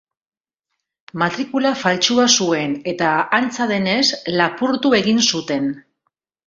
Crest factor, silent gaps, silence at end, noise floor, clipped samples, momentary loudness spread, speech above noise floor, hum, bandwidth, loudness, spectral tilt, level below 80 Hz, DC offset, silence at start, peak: 18 dB; none; 0.65 s; under -90 dBFS; under 0.1%; 8 LU; over 72 dB; none; 7.8 kHz; -17 LUFS; -3 dB/octave; -60 dBFS; under 0.1%; 1.15 s; 0 dBFS